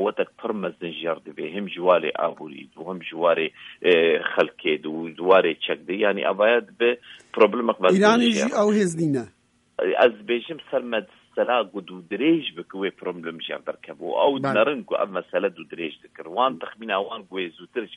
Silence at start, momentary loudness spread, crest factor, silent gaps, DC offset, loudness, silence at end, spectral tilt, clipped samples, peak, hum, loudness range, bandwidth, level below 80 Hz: 0 s; 14 LU; 20 dB; none; under 0.1%; -23 LUFS; 0 s; -5 dB/octave; under 0.1%; -4 dBFS; none; 6 LU; 11 kHz; -72 dBFS